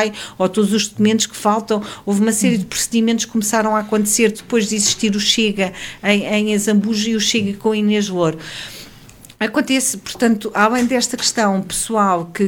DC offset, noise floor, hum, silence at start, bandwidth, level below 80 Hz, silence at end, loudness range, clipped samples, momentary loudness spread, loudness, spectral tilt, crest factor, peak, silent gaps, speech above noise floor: under 0.1%; -42 dBFS; none; 0 s; 17.5 kHz; -52 dBFS; 0 s; 2 LU; under 0.1%; 6 LU; -17 LUFS; -3.5 dB/octave; 16 dB; -2 dBFS; none; 25 dB